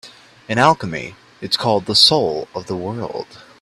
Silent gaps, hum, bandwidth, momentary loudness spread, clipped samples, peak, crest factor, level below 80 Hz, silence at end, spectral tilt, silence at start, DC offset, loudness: none; none; 14 kHz; 20 LU; under 0.1%; 0 dBFS; 20 dB; -54 dBFS; 0.2 s; -4 dB/octave; 0.05 s; under 0.1%; -16 LUFS